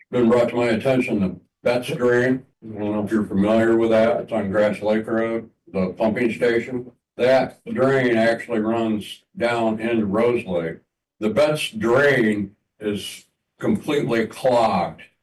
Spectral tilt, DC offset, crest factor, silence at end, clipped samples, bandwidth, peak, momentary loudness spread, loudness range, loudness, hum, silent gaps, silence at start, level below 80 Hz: -6.5 dB/octave; under 0.1%; 10 dB; 0.2 s; under 0.1%; 12.5 kHz; -10 dBFS; 12 LU; 2 LU; -21 LUFS; none; none; 0.1 s; -58 dBFS